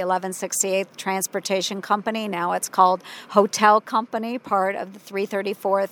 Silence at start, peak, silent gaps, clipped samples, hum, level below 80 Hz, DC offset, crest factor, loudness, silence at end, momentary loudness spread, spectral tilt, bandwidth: 0 s; -2 dBFS; none; under 0.1%; none; -80 dBFS; under 0.1%; 20 dB; -22 LUFS; 0.05 s; 10 LU; -3 dB/octave; 19.5 kHz